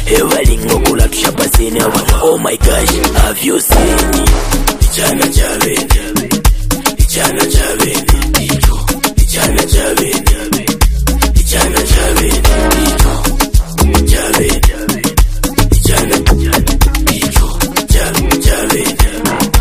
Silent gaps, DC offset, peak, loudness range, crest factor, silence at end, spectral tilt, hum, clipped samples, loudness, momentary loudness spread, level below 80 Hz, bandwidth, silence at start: none; 1%; 0 dBFS; 1 LU; 10 dB; 0 s; -4 dB/octave; none; 0.3%; -11 LUFS; 3 LU; -12 dBFS; 16 kHz; 0 s